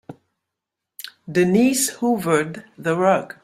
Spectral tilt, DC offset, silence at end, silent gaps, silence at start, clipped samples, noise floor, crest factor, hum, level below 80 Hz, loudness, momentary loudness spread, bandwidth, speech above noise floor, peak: -4.5 dB/octave; under 0.1%; 0.15 s; none; 0.1 s; under 0.1%; -83 dBFS; 18 dB; none; -62 dBFS; -20 LUFS; 18 LU; 16 kHz; 64 dB; -4 dBFS